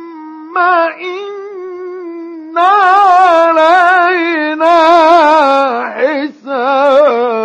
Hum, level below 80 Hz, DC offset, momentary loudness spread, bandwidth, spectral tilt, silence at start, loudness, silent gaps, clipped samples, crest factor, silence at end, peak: none; -62 dBFS; under 0.1%; 18 LU; 10 kHz; -3 dB/octave; 0 s; -9 LUFS; none; 0.5%; 10 dB; 0 s; 0 dBFS